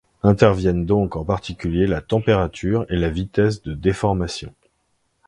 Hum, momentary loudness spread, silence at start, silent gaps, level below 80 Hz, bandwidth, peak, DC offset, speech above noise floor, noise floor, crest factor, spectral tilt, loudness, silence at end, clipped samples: none; 9 LU; 0.25 s; none; -36 dBFS; 11 kHz; 0 dBFS; under 0.1%; 49 dB; -68 dBFS; 20 dB; -7.5 dB/octave; -20 LUFS; 0.8 s; under 0.1%